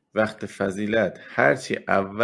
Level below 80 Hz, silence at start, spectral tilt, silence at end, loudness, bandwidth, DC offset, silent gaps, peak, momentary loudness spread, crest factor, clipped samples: -62 dBFS; 0.15 s; -5.5 dB/octave; 0 s; -24 LUFS; 12 kHz; under 0.1%; none; -4 dBFS; 6 LU; 20 dB; under 0.1%